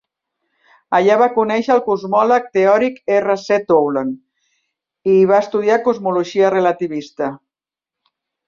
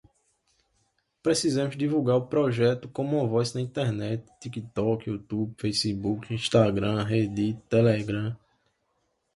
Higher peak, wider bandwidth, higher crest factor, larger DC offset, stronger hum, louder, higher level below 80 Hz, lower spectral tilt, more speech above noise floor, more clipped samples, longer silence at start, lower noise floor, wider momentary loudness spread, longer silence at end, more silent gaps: first, -2 dBFS vs -8 dBFS; second, 7.4 kHz vs 11.5 kHz; about the same, 16 dB vs 20 dB; neither; neither; first, -16 LUFS vs -27 LUFS; second, -62 dBFS vs -56 dBFS; about the same, -6 dB/octave vs -6 dB/octave; first, 73 dB vs 48 dB; neither; second, 0.9 s vs 1.25 s; first, -88 dBFS vs -74 dBFS; about the same, 11 LU vs 10 LU; about the same, 1.1 s vs 1 s; neither